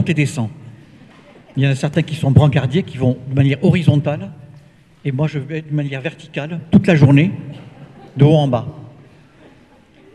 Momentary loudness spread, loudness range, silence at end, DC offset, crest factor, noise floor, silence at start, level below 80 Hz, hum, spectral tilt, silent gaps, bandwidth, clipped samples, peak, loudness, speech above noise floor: 15 LU; 3 LU; 1.25 s; under 0.1%; 16 dB; -48 dBFS; 0 s; -46 dBFS; none; -8 dB/octave; none; 11 kHz; under 0.1%; 0 dBFS; -16 LUFS; 33 dB